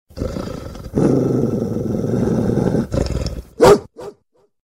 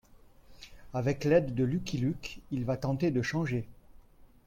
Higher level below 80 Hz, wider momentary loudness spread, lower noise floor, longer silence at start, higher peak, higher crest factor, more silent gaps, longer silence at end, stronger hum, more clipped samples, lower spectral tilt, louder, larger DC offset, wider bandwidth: first, -32 dBFS vs -54 dBFS; first, 17 LU vs 14 LU; about the same, -59 dBFS vs -56 dBFS; second, 0.15 s vs 0.5 s; first, 0 dBFS vs -12 dBFS; about the same, 18 dB vs 20 dB; neither; first, 0.55 s vs 0.2 s; neither; neither; about the same, -7 dB/octave vs -7 dB/octave; first, -18 LUFS vs -31 LUFS; neither; about the same, 16 kHz vs 16 kHz